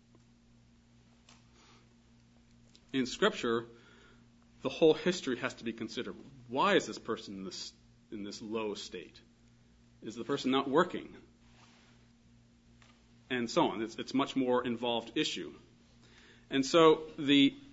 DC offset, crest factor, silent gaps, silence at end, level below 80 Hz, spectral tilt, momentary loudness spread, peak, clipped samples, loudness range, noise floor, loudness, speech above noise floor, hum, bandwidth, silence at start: under 0.1%; 24 dB; none; 0.05 s; -68 dBFS; -3 dB/octave; 19 LU; -10 dBFS; under 0.1%; 7 LU; -63 dBFS; -32 LUFS; 31 dB; 60 Hz at -65 dBFS; 7.6 kHz; 2.95 s